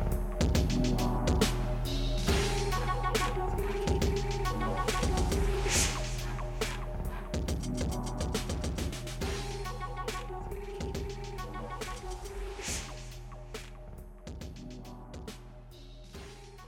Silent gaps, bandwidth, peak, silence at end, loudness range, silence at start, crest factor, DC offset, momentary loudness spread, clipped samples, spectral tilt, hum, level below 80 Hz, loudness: none; 17 kHz; -14 dBFS; 0 s; 12 LU; 0 s; 18 dB; under 0.1%; 17 LU; under 0.1%; -4.5 dB/octave; none; -36 dBFS; -33 LUFS